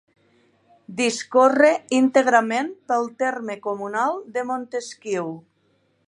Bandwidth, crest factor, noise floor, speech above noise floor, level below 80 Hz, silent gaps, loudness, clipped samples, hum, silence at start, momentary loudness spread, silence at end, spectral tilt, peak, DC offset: 11.5 kHz; 20 dB; -65 dBFS; 44 dB; -78 dBFS; none; -21 LUFS; under 0.1%; none; 0.9 s; 13 LU; 0.65 s; -3.5 dB/octave; -2 dBFS; under 0.1%